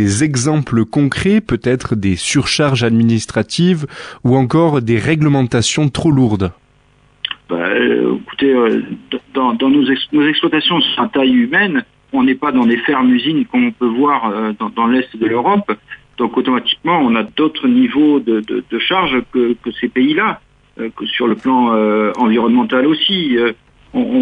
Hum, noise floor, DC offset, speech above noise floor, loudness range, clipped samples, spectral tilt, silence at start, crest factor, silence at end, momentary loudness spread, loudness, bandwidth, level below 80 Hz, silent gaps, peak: none; -51 dBFS; under 0.1%; 38 dB; 2 LU; under 0.1%; -5.5 dB/octave; 0 s; 12 dB; 0 s; 7 LU; -14 LUFS; 10.5 kHz; -46 dBFS; none; -2 dBFS